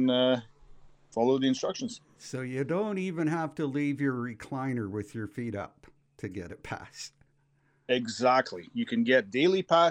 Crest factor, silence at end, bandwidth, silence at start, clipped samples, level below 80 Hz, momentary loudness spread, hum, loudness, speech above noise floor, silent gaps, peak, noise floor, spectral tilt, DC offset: 18 dB; 0 s; 10.5 kHz; 0 s; under 0.1%; -66 dBFS; 16 LU; none; -30 LUFS; 40 dB; none; -10 dBFS; -69 dBFS; -5.5 dB/octave; under 0.1%